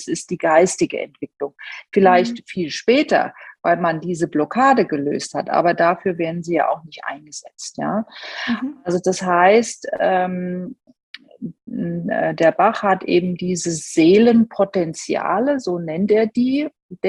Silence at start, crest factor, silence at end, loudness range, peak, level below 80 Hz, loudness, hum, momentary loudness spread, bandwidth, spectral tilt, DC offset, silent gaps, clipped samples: 0 s; 18 dB; 0 s; 4 LU; -2 dBFS; -62 dBFS; -18 LUFS; none; 15 LU; 11.5 kHz; -5 dB/octave; under 0.1%; 11.03-11.14 s, 16.82-16.89 s; under 0.1%